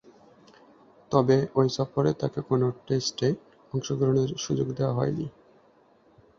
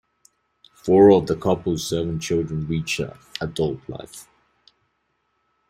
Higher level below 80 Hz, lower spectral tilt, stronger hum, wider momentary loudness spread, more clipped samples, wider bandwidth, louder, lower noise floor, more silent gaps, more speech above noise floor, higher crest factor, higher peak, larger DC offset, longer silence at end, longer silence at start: second, -60 dBFS vs -50 dBFS; about the same, -6.5 dB/octave vs -6 dB/octave; neither; second, 10 LU vs 20 LU; neither; second, 7.6 kHz vs 15.5 kHz; second, -27 LUFS vs -21 LUFS; second, -60 dBFS vs -71 dBFS; neither; second, 35 dB vs 51 dB; about the same, 20 dB vs 20 dB; about the same, -6 dBFS vs -4 dBFS; neither; second, 1.1 s vs 1.5 s; first, 1.1 s vs 0.85 s